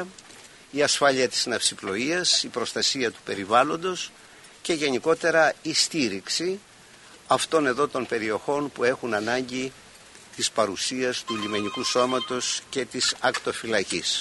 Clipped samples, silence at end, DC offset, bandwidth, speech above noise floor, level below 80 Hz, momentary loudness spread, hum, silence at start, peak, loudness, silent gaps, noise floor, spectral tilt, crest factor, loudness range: under 0.1%; 0 s; under 0.1%; 11.5 kHz; 25 dB; -66 dBFS; 10 LU; none; 0 s; -6 dBFS; -24 LUFS; none; -50 dBFS; -2 dB/octave; 20 dB; 3 LU